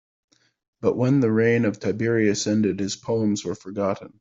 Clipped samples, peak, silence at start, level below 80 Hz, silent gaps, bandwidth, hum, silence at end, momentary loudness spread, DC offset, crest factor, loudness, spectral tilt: under 0.1%; -6 dBFS; 0.8 s; -62 dBFS; none; 7.8 kHz; none; 0.1 s; 8 LU; under 0.1%; 16 dB; -23 LUFS; -6 dB/octave